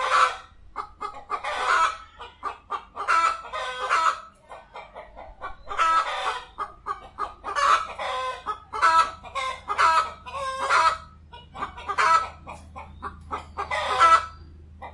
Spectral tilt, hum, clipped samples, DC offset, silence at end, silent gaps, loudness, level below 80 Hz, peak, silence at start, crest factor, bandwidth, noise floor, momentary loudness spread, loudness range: -1.5 dB/octave; none; under 0.1%; under 0.1%; 0 s; none; -24 LUFS; -52 dBFS; -6 dBFS; 0 s; 20 dB; 11.5 kHz; -47 dBFS; 21 LU; 4 LU